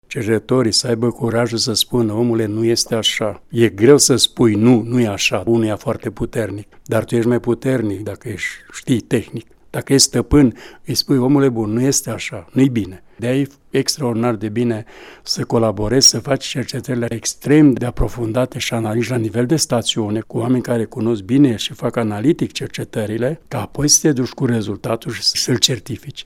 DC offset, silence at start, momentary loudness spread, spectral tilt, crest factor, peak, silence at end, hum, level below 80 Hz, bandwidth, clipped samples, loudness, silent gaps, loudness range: under 0.1%; 0.1 s; 12 LU; -4.5 dB/octave; 18 dB; 0 dBFS; 0 s; none; -38 dBFS; 16.5 kHz; under 0.1%; -17 LUFS; none; 5 LU